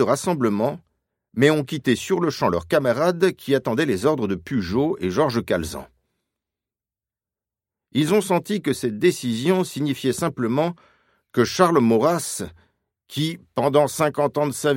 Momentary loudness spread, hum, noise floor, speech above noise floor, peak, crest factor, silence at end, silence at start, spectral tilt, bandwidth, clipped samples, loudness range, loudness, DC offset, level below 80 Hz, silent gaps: 8 LU; none; under -90 dBFS; over 69 dB; 0 dBFS; 22 dB; 0 s; 0 s; -5.5 dB/octave; 16.5 kHz; under 0.1%; 5 LU; -21 LUFS; under 0.1%; -54 dBFS; none